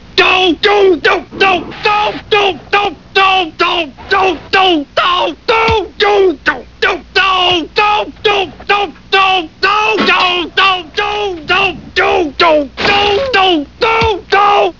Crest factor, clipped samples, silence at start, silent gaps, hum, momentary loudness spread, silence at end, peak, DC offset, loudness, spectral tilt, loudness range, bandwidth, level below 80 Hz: 12 dB; under 0.1%; 0.05 s; none; none; 5 LU; 0.05 s; 0 dBFS; 0.6%; -11 LUFS; -4 dB/octave; 1 LU; 6 kHz; -38 dBFS